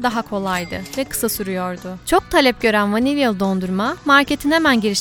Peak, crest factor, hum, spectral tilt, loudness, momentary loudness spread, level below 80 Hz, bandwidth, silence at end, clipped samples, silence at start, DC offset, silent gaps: 0 dBFS; 18 dB; none; -4 dB/octave; -18 LUFS; 10 LU; -42 dBFS; 19.5 kHz; 0 s; under 0.1%; 0 s; under 0.1%; none